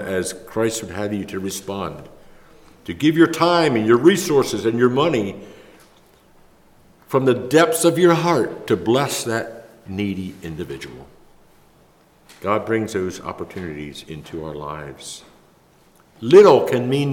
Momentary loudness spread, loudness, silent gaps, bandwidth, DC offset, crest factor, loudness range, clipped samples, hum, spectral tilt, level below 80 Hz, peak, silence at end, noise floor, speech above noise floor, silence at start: 19 LU; -18 LUFS; none; 17 kHz; under 0.1%; 18 dB; 11 LU; under 0.1%; none; -5 dB/octave; -54 dBFS; -2 dBFS; 0 s; -54 dBFS; 35 dB; 0 s